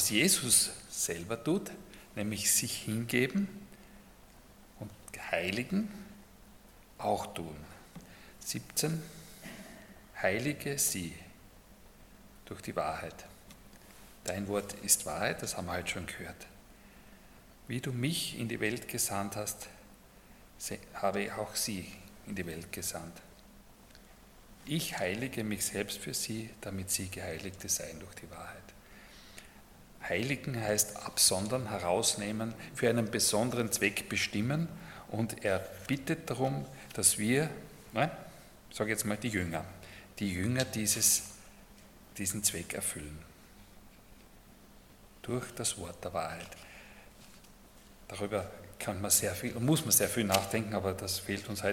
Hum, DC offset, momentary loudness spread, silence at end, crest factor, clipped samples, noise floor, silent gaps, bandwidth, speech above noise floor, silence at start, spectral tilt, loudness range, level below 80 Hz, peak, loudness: none; under 0.1%; 21 LU; 0 s; 26 dB; under 0.1%; -57 dBFS; none; 17.5 kHz; 23 dB; 0 s; -3 dB/octave; 10 LU; -60 dBFS; -10 dBFS; -32 LUFS